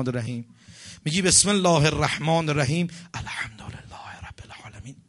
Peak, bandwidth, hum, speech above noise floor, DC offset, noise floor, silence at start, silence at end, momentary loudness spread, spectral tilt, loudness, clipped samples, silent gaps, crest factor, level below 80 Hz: -6 dBFS; 11.5 kHz; none; 19 dB; under 0.1%; -43 dBFS; 0 s; 0.15 s; 24 LU; -3.5 dB/octave; -22 LUFS; under 0.1%; none; 20 dB; -48 dBFS